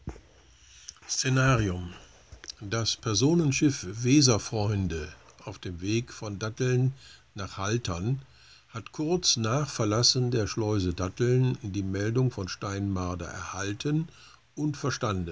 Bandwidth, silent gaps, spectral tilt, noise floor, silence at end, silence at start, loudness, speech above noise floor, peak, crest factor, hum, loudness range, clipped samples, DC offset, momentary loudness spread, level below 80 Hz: 8 kHz; none; -4.5 dB/octave; -57 dBFS; 0 s; 0.05 s; -28 LUFS; 29 dB; -8 dBFS; 20 dB; none; 5 LU; under 0.1%; 0.1%; 19 LU; -48 dBFS